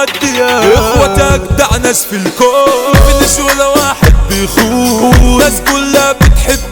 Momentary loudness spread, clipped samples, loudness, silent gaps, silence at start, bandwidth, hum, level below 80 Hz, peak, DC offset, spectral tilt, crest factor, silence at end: 4 LU; 0.8%; -8 LUFS; none; 0 s; 20 kHz; none; -14 dBFS; 0 dBFS; under 0.1%; -4 dB/octave; 8 dB; 0 s